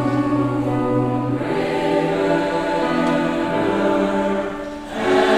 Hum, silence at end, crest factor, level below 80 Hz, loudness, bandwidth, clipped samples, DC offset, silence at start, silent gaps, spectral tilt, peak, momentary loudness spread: none; 0 s; 16 dB; -44 dBFS; -20 LUFS; 13 kHz; under 0.1%; under 0.1%; 0 s; none; -6.5 dB/octave; -4 dBFS; 4 LU